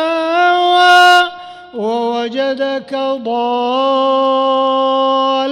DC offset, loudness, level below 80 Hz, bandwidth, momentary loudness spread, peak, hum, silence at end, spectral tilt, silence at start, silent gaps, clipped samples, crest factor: under 0.1%; -13 LUFS; -62 dBFS; 15.5 kHz; 11 LU; -2 dBFS; none; 0 s; -2.5 dB/octave; 0 s; none; under 0.1%; 12 dB